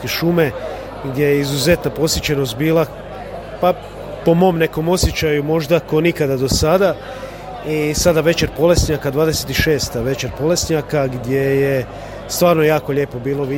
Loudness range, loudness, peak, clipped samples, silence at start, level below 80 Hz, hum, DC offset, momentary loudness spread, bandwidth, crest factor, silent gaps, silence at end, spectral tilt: 2 LU; -17 LUFS; 0 dBFS; under 0.1%; 0 s; -32 dBFS; none; under 0.1%; 13 LU; 17 kHz; 16 dB; none; 0 s; -5 dB/octave